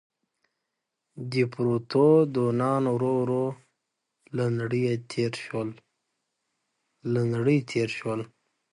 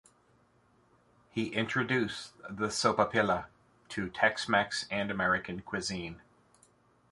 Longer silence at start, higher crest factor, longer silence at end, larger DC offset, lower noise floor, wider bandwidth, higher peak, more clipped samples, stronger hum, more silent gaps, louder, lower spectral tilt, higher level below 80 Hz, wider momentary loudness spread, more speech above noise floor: second, 1.15 s vs 1.35 s; second, 18 dB vs 24 dB; second, 0.45 s vs 0.9 s; neither; first, -83 dBFS vs -67 dBFS; about the same, 11 kHz vs 11.5 kHz; about the same, -8 dBFS vs -10 dBFS; neither; neither; neither; first, -26 LUFS vs -31 LUFS; first, -7.5 dB/octave vs -4 dB/octave; second, -68 dBFS vs -62 dBFS; about the same, 13 LU vs 12 LU; first, 58 dB vs 35 dB